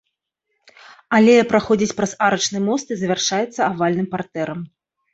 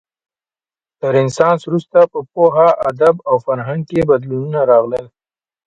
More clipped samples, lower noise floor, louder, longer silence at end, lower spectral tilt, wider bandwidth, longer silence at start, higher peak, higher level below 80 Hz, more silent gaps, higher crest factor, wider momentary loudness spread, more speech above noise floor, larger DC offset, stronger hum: neither; second, -76 dBFS vs under -90 dBFS; second, -18 LUFS vs -14 LUFS; about the same, 0.5 s vs 0.6 s; second, -4.5 dB/octave vs -7 dB/octave; second, 8 kHz vs 9 kHz; about the same, 1.1 s vs 1.05 s; about the same, -2 dBFS vs 0 dBFS; second, -58 dBFS vs -52 dBFS; neither; about the same, 18 dB vs 14 dB; first, 13 LU vs 8 LU; second, 57 dB vs over 76 dB; neither; neither